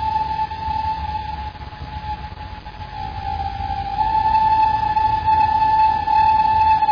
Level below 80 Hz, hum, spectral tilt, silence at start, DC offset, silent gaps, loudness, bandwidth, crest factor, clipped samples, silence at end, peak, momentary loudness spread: -36 dBFS; none; -6 dB/octave; 0 s; under 0.1%; none; -19 LUFS; 5.2 kHz; 10 dB; under 0.1%; 0 s; -10 dBFS; 17 LU